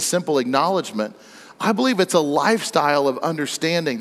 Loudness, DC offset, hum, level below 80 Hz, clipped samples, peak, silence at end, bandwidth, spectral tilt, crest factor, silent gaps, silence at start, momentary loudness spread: -20 LUFS; under 0.1%; none; -74 dBFS; under 0.1%; -4 dBFS; 0 s; 15 kHz; -4 dB/octave; 16 dB; none; 0 s; 7 LU